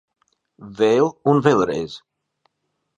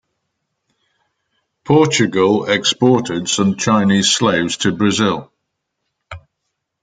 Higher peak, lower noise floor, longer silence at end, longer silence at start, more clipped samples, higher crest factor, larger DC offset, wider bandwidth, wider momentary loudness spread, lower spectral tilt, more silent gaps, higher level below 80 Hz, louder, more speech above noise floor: about the same, 0 dBFS vs -2 dBFS; about the same, -75 dBFS vs -75 dBFS; first, 1 s vs 0.65 s; second, 0.6 s vs 1.65 s; neither; about the same, 20 dB vs 16 dB; neither; about the same, 9.4 kHz vs 9.6 kHz; first, 20 LU vs 5 LU; first, -6.5 dB/octave vs -4 dB/octave; neither; about the same, -58 dBFS vs -56 dBFS; second, -18 LUFS vs -15 LUFS; about the same, 57 dB vs 60 dB